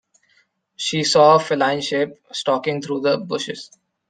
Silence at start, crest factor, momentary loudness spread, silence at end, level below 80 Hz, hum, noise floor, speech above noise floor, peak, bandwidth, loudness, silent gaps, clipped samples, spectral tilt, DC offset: 0.8 s; 18 dB; 13 LU; 0.45 s; -66 dBFS; none; -62 dBFS; 43 dB; -2 dBFS; 9.6 kHz; -19 LUFS; none; under 0.1%; -4 dB/octave; under 0.1%